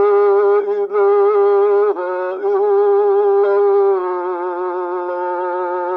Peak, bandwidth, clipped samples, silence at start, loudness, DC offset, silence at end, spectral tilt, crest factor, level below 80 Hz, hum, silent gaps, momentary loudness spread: -6 dBFS; 4.3 kHz; under 0.1%; 0 s; -15 LUFS; under 0.1%; 0 s; -6.5 dB/octave; 10 dB; -78 dBFS; none; none; 8 LU